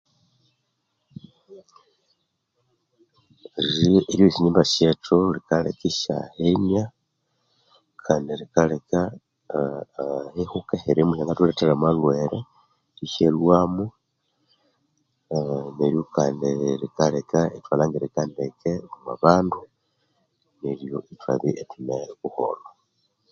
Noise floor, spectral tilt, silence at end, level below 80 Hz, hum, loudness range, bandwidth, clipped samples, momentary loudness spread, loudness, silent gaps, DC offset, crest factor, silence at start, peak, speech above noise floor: -74 dBFS; -6.5 dB/octave; 0.65 s; -52 dBFS; none; 6 LU; 7.8 kHz; under 0.1%; 13 LU; -23 LUFS; none; under 0.1%; 24 dB; 1.5 s; 0 dBFS; 52 dB